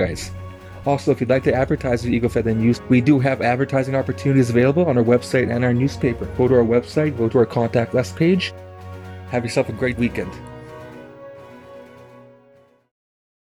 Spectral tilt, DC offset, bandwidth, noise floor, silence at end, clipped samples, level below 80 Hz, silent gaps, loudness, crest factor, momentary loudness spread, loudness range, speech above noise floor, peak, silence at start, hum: -7 dB/octave; under 0.1%; 13 kHz; -53 dBFS; 1.25 s; under 0.1%; -44 dBFS; none; -19 LUFS; 16 dB; 20 LU; 9 LU; 35 dB; -4 dBFS; 0 s; none